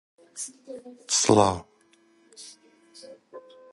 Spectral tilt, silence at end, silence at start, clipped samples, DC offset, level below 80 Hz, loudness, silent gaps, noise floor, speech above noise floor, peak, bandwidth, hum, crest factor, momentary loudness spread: -3.5 dB/octave; 0.35 s; 0.35 s; under 0.1%; under 0.1%; -56 dBFS; -24 LUFS; none; -61 dBFS; 37 dB; -4 dBFS; 11.5 kHz; none; 26 dB; 27 LU